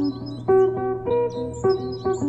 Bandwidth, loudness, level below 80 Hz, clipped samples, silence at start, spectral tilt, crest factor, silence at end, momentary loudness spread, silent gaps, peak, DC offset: 8 kHz; -23 LUFS; -48 dBFS; under 0.1%; 0 s; -7.5 dB/octave; 14 dB; 0 s; 8 LU; none; -8 dBFS; 0.1%